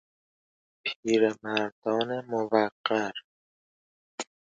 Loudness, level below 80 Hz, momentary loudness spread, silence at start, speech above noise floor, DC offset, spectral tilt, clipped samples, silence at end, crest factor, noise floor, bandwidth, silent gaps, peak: -28 LUFS; -74 dBFS; 15 LU; 0.85 s; over 63 dB; under 0.1%; -4.5 dB/octave; under 0.1%; 0.25 s; 22 dB; under -90 dBFS; 9 kHz; 0.96-1.03 s, 1.72-1.82 s, 2.72-2.84 s, 3.24-4.18 s; -8 dBFS